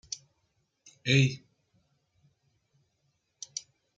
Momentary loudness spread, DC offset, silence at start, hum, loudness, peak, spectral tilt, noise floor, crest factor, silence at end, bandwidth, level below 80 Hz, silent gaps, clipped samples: 20 LU; under 0.1%; 0.1 s; none; -28 LUFS; -10 dBFS; -4.5 dB/octave; -76 dBFS; 24 dB; 0.35 s; 7.8 kHz; -70 dBFS; none; under 0.1%